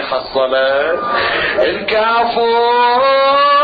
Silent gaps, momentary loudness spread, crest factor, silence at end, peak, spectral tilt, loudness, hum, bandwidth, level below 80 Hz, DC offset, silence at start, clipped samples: none; 5 LU; 10 dB; 0 s; -2 dBFS; -6 dB/octave; -13 LUFS; none; 5 kHz; -48 dBFS; under 0.1%; 0 s; under 0.1%